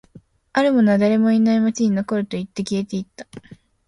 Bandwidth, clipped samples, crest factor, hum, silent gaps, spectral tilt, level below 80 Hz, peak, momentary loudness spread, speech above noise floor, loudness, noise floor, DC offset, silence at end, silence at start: 11 kHz; under 0.1%; 14 dB; none; none; -6.5 dB/octave; -58 dBFS; -6 dBFS; 14 LU; 30 dB; -19 LUFS; -49 dBFS; under 0.1%; 0.35 s; 0.55 s